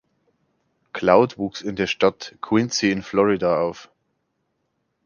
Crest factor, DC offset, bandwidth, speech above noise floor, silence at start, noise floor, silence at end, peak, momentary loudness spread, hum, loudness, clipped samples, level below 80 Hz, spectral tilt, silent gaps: 22 dB; under 0.1%; 7.2 kHz; 53 dB; 0.95 s; -73 dBFS; 1.2 s; 0 dBFS; 11 LU; none; -21 LUFS; under 0.1%; -56 dBFS; -5 dB/octave; none